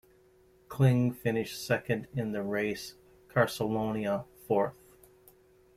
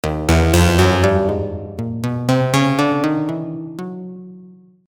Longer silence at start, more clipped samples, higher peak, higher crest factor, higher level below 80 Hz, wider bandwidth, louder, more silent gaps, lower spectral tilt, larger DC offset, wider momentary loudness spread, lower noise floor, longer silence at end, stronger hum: first, 0.7 s vs 0.05 s; neither; second, -10 dBFS vs -2 dBFS; first, 22 dB vs 16 dB; second, -64 dBFS vs -30 dBFS; second, 15.5 kHz vs over 20 kHz; second, -31 LUFS vs -17 LUFS; neither; about the same, -6.5 dB/octave vs -6 dB/octave; neither; second, 9 LU vs 16 LU; first, -62 dBFS vs -43 dBFS; first, 1.05 s vs 0.35 s; neither